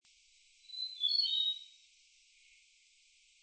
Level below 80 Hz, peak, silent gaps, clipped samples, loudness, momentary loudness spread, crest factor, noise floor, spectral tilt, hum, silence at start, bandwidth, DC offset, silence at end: -88 dBFS; -22 dBFS; none; under 0.1%; -32 LUFS; 17 LU; 18 dB; -67 dBFS; 6.5 dB/octave; none; 0.7 s; 8.8 kHz; under 0.1%; 1.75 s